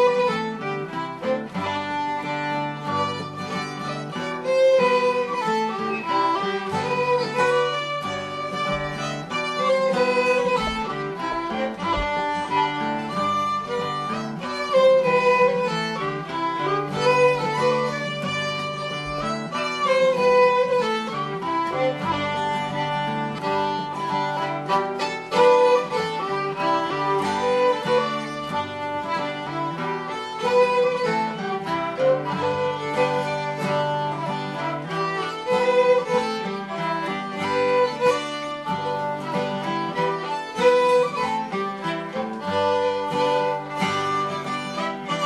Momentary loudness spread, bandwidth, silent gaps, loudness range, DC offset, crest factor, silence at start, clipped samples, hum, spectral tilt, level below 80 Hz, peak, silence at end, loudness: 9 LU; 12 kHz; none; 3 LU; under 0.1%; 16 dB; 0 s; under 0.1%; none; -5 dB/octave; -52 dBFS; -6 dBFS; 0 s; -23 LUFS